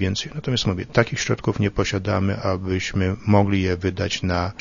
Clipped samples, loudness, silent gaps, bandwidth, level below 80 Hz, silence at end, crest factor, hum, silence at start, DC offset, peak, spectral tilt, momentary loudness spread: under 0.1%; -22 LUFS; none; 7.4 kHz; -42 dBFS; 0 s; 22 dB; none; 0 s; under 0.1%; 0 dBFS; -5.5 dB/octave; 5 LU